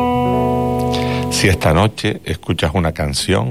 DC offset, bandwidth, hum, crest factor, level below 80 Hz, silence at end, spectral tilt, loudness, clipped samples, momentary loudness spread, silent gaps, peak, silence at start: 0.5%; 16 kHz; none; 12 dB; -34 dBFS; 0 s; -5 dB/octave; -17 LUFS; under 0.1%; 7 LU; none; -4 dBFS; 0 s